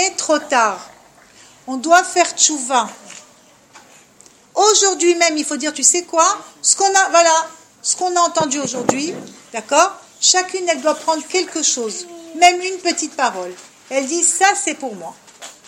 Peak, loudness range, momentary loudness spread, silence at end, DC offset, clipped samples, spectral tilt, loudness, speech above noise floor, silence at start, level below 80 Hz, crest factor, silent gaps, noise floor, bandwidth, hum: 0 dBFS; 4 LU; 16 LU; 0.15 s; under 0.1%; under 0.1%; -0.5 dB/octave; -15 LUFS; 32 dB; 0 s; -66 dBFS; 18 dB; none; -49 dBFS; 16.5 kHz; none